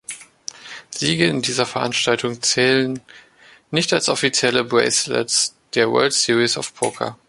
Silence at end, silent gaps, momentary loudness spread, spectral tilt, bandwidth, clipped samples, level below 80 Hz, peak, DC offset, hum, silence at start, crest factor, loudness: 0.15 s; none; 16 LU; -2.5 dB/octave; 11.5 kHz; under 0.1%; -60 dBFS; 0 dBFS; under 0.1%; none; 0.1 s; 20 dB; -18 LUFS